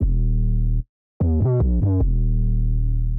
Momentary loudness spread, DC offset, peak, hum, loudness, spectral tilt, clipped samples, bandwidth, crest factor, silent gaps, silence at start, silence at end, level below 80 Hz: 6 LU; under 0.1%; -12 dBFS; none; -22 LUFS; -14 dB/octave; under 0.1%; 1.5 kHz; 6 dB; 0.89-1.20 s; 0 s; 0 s; -20 dBFS